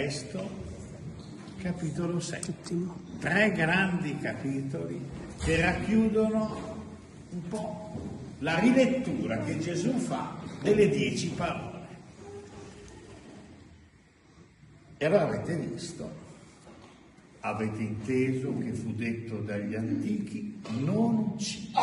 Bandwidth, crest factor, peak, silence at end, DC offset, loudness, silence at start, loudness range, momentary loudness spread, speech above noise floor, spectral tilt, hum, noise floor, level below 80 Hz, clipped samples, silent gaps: 11.5 kHz; 20 dB; -10 dBFS; 0 s; under 0.1%; -30 LUFS; 0 s; 7 LU; 20 LU; 30 dB; -6 dB/octave; none; -59 dBFS; -54 dBFS; under 0.1%; none